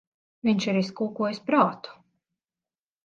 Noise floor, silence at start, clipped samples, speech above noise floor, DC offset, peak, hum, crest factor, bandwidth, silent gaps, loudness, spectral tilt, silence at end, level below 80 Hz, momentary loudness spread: under -90 dBFS; 0.45 s; under 0.1%; over 65 dB; under 0.1%; -6 dBFS; none; 22 dB; 7.6 kHz; none; -26 LUFS; -6 dB/octave; 1.15 s; -72 dBFS; 11 LU